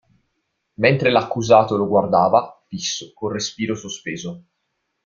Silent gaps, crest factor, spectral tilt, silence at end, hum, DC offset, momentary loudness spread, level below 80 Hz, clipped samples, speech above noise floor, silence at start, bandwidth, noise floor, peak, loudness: none; 20 dB; -4.5 dB/octave; 0.65 s; none; under 0.1%; 14 LU; -58 dBFS; under 0.1%; 55 dB; 0.8 s; 7.4 kHz; -74 dBFS; -2 dBFS; -19 LUFS